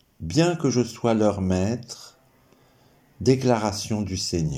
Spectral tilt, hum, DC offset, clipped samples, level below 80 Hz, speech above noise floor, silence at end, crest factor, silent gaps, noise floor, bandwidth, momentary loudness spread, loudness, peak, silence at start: -5.5 dB/octave; none; under 0.1%; under 0.1%; -50 dBFS; 35 dB; 0 s; 20 dB; none; -58 dBFS; 16 kHz; 7 LU; -23 LUFS; -6 dBFS; 0.2 s